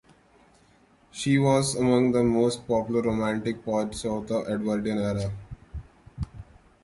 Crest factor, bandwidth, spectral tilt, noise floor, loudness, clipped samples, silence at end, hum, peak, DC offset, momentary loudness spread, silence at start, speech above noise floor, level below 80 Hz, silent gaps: 16 dB; 11.5 kHz; -6 dB/octave; -59 dBFS; -25 LUFS; under 0.1%; 0.4 s; none; -10 dBFS; under 0.1%; 19 LU; 1.15 s; 35 dB; -48 dBFS; none